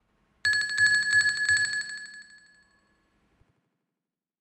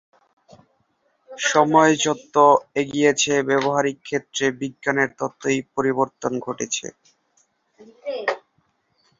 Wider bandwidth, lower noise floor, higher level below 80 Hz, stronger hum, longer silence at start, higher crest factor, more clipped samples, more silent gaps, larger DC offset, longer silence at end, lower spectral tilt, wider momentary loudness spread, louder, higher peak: first, 13 kHz vs 7.8 kHz; first, -89 dBFS vs -67 dBFS; about the same, -68 dBFS vs -66 dBFS; neither; second, 0.45 s vs 1.3 s; about the same, 16 dB vs 20 dB; neither; neither; neither; first, 2.2 s vs 0.8 s; second, 1.5 dB/octave vs -3.5 dB/octave; first, 16 LU vs 12 LU; about the same, -23 LUFS vs -21 LUFS; second, -12 dBFS vs -2 dBFS